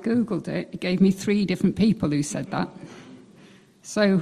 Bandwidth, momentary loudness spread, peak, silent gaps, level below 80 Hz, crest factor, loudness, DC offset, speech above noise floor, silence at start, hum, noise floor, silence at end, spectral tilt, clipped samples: 13.5 kHz; 19 LU; -8 dBFS; none; -54 dBFS; 16 dB; -24 LUFS; under 0.1%; 29 dB; 0 s; none; -52 dBFS; 0 s; -6 dB/octave; under 0.1%